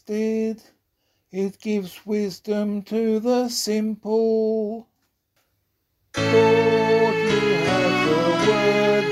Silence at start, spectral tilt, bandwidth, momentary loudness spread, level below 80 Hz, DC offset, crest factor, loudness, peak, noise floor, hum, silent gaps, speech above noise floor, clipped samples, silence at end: 0.1 s; -5 dB/octave; 15 kHz; 10 LU; -58 dBFS; under 0.1%; 18 dB; -21 LUFS; -4 dBFS; -72 dBFS; none; none; 50 dB; under 0.1%; 0 s